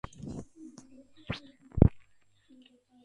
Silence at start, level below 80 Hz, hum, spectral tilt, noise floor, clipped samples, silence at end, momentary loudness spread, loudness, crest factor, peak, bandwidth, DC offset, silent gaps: 0.25 s; -40 dBFS; none; -8.5 dB/octave; -63 dBFS; under 0.1%; 1.1 s; 25 LU; -31 LUFS; 32 dB; 0 dBFS; 9.2 kHz; under 0.1%; none